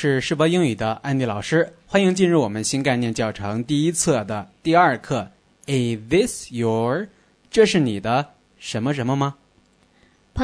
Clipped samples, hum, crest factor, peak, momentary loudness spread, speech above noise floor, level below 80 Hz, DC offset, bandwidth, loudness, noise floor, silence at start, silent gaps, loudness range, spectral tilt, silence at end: under 0.1%; none; 18 dB; -2 dBFS; 10 LU; 38 dB; -52 dBFS; under 0.1%; 11 kHz; -21 LUFS; -58 dBFS; 0 s; none; 2 LU; -5 dB/octave; 0 s